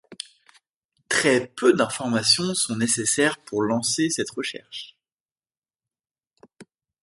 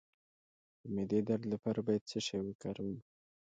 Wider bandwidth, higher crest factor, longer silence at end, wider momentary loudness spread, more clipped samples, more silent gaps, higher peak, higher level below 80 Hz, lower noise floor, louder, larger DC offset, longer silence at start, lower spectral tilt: first, 11.5 kHz vs 9 kHz; about the same, 22 dB vs 18 dB; about the same, 0.4 s vs 0.45 s; first, 18 LU vs 9 LU; neither; first, 0.76-0.89 s, 5.12-5.26 s, 5.58-5.62 s vs 2.01-2.06 s, 2.55-2.59 s; first, -4 dBFS vs -20 dBFS; about the same, -66 dBFS vs -70 dBFS; about the same, under -90 dBFS vs under -90 dBFS; first, -22 LUFS vs -38 LUFS; neither; second, 0.1 s vs 0.85 s; second, -3 dB/octave vs -6 dB/octave